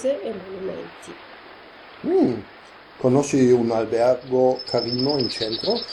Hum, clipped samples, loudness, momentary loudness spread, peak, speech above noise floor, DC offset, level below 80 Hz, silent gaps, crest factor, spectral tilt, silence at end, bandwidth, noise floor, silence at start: none; under 0.1%; -22 LUFS; 20 LU; -6 dBFS; 22 dB; under 0.1%; -58 dBFS; none; 16 dB; -5.5 dB/octave; 0 s; 11.5 kHz; -44 dBFS; 0 s